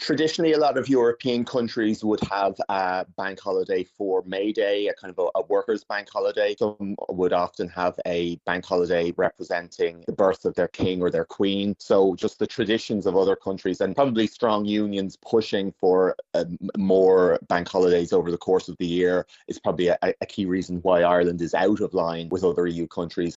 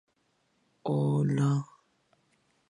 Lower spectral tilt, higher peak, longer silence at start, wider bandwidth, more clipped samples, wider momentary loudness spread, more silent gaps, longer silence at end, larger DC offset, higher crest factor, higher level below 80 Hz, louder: second, -4.5 dB/octave vs -8.5 dB/octave; first, -4 dBFS vs -18 dBFS; second, 0 s vs 0.85 s; second, 8 kHz vs 10.5 kHz; neither; second, 7 LU vs 13 LU; neither; second, 0 s vs 1.05 s; neither; about the same, 18 dB vs 14 dB; first, -58 dBFS vs -72 dBFS; first, -24 LUFS vs -29 LUFS